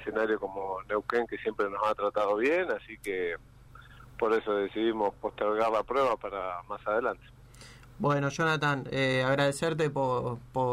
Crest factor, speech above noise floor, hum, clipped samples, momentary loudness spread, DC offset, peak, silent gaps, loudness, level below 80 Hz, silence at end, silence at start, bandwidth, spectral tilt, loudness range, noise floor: 16 dB; 22 dB; none; under 0.1%; 9 LU; under 0.1%; -14 dBFS; none; -30 LUFS; -58 dBFS; 0 s; 0 s; 15 kHz; -5.5 dB/octave; 2 LU; -51 dBFS